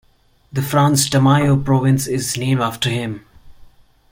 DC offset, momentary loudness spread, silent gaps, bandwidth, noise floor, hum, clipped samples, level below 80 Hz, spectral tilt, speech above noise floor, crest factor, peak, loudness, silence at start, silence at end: under 0.1%; 11 LU; none; 17 kHz; -54 dBFS; none; under 0.1%; -44 dBFS; -5 dB/octave; 38 dB; 16 dB; -2 dBFS; -17 LUFS; 0.55 s; 0.5 s